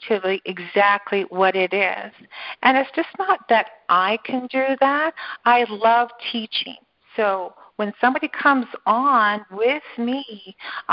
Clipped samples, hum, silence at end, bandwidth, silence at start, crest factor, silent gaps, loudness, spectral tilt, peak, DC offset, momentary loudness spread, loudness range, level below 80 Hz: under 0.1%; none; 0 s; 5.6 kHz; 0 s; 20 dB; none; -20 LUFS; -8.5 dB/octave; -2 dBFS; under 0.1%; 13 LU; 2 LU; -68 dBFS